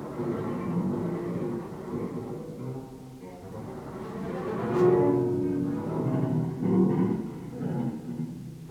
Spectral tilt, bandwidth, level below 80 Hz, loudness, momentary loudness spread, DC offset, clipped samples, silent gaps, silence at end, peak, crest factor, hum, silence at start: -9.5 dB/octave; 13.5 kHz; -58 dBFS; -29 LUFS; 16 LU; under 0.1%; under 0.1%; none; 0 s; -12 dBFS; 18 dB; none; 0 s